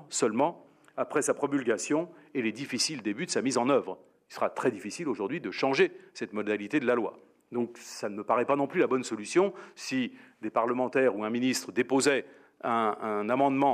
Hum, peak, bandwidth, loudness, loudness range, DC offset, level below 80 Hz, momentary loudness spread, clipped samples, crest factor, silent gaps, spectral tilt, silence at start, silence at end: none; -10 dBFS; 15 kHz; -29 LUFS; 2 LU; under 0.1%; -84 dBFS; 11 LU; under 0.1%; 20 dB; none; -4 dB/octave; 0 s; 0 s